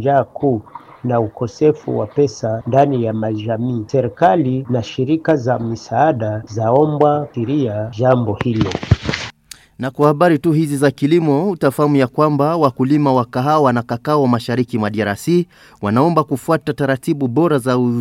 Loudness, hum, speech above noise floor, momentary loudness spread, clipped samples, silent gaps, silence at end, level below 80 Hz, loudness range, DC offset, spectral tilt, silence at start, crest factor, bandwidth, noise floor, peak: -16 LUFS; none; 26 dB; 7 LU; under 0.1%; none; 0 s; -44 dBFS; 3 LU; under 0.1%; -7.5 dB/octave; 0 s; 16 dB; 15.5 kHz; -41 dBFS; 0 dBFS